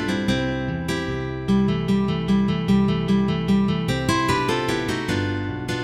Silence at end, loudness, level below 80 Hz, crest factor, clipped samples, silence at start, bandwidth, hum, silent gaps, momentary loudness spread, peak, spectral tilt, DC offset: 0 s; -22 LUFS; -40 dBFS; 14 dB; under 0.1%; 0 s; 14 kHz; none; none; 6 LU; -6 dBFS; -6 dB/octave; under 0.1%